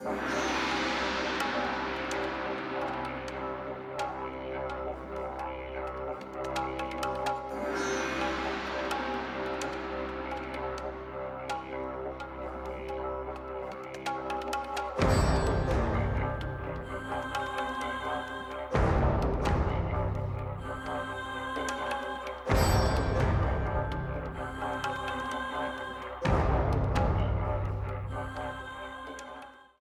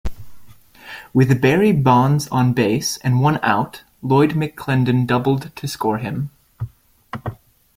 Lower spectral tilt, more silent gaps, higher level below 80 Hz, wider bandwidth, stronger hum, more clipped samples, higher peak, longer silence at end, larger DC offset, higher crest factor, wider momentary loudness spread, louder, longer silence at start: about the same, -5.5 dB/octave vs -6.5 dB/octave; neither; about the same, -40 dBFS vs -44 dBFS; second, 14.5 kHz vs 16 kHz; neither; neither; second, -12 dBFS vs -2 dBFS; second, 0.15 s vs 0.4 s; neither; about the same, 20 dB vs 16 dB; second, 10 LU vs 18 LU; second, -33 LUFS vs -18 LUFS; about the same, 0 s vs 0.05 s